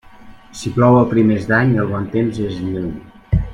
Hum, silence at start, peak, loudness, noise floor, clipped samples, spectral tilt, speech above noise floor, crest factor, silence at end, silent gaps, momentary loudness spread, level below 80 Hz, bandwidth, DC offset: none; 0.2 s; 0 dBFS; -16 LUFS; -40 dBFS; under 0.1%; -8 dB/octave; 24 dB; 16 dB; 0 s; none; 15 LU; -34 dBFS; 11 kHz; under 0.1%